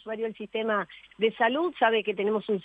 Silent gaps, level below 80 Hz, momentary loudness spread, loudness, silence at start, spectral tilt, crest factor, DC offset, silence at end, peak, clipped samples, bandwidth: none; -72 dBFS; 9 LU; -27 LUFS; 0.05 s; -7 dB/octave; 18 dB; under 0.1%; 0.05 s; -10 dBFS; under 0.1%; 4.7 kHz